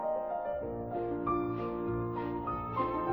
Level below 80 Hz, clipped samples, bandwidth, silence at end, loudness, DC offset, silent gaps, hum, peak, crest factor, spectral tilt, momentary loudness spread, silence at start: -52 dBFS; under 0.1%; over 20 kHz; 0 s; -35 LUFS; under 0.1%; none; none; -20 dBFS; 14 dB; -10.5 dB/octave; 4 LU; 0 s